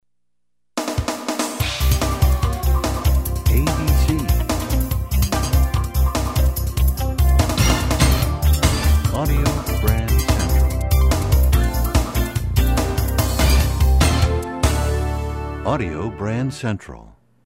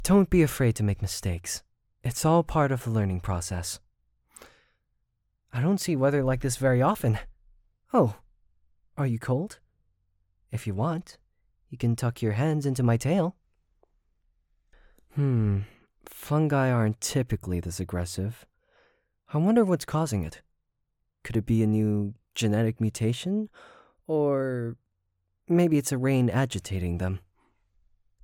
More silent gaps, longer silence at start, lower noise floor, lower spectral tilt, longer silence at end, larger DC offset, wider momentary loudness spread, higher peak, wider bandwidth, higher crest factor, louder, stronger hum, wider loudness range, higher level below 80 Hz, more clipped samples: neither; first, 0.75 s vs 0 s; about the same, -81 dBFS vs -78 dBFS; second, -5 dB/octave vs -6.5 dB/octave; second, 0.45 s vs 1.05 s; neither; second, 7 LU vs 13 LU; first, -2 dBFS vs -8 dBFS; about the same, 16.5 kHz vs 18 kHz; about the same, 16 dB vs 18 dB; first, -19 LUFS vs -27 LUFS; neither; second, 2 LU vs 5 LU; first, -20 dBFS vs -48 dBFS; neither